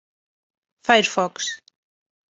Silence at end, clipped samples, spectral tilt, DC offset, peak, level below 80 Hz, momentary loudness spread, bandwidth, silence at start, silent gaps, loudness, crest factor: 0.75 s; under 0.1%; -2 dB/octave; under 0.1%; -2 dBFS; -72 dBFS; 13 LU; 8.2 kHz; 0.85 s; none; -21 LUFS; 24 dB